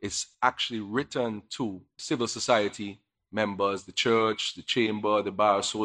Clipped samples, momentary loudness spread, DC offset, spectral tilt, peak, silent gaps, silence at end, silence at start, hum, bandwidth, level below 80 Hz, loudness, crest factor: under 0.1%; 10 LU; under 0.1%; -3.5 dB/octave; -8 dBFS; none; 0 s; 0 s; none; 11 kHz; -68 dBFS; -28 LUFS; 20 dB